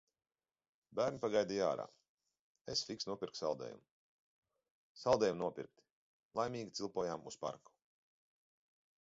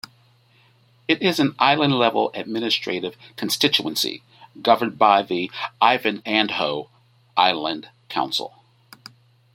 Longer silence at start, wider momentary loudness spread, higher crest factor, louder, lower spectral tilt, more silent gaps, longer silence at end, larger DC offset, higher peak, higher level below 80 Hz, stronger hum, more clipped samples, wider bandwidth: second, 0.9 s vs 1.1 s; first, 17 LU vs 13 LU; about the same, 24 dB vs 22 dB; second, -39 LUFS vs -21 LUFS; about the same, -3.5 dB/octave vs -4 dB/octave; first, 2.09-2.18 s, 2.39-2.55 s, 2.61-2.65 s, 3.91-4.43 s, 4.71-4.95 s, 5.91-6.31 s vs none; first, 1.45 s vs 1.05 s; neither; second, -18 dBFS vs 0 dBFS; second, -76 dBFS vs -68 dBFS; neither; neither; second, 7.6 kHz vs 16.5 kHz